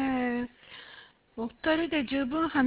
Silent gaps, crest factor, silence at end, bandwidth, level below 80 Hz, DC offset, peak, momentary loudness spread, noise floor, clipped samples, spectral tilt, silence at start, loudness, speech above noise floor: none; 16 dB; 0 s; 4 kHz; -58 dBFS; under 0.1%; -14 dBFS; 19 LU; -53 dBFS; under 0.1%; -2.5 dB/octave; 0 s; -30 LUFS; 25 dB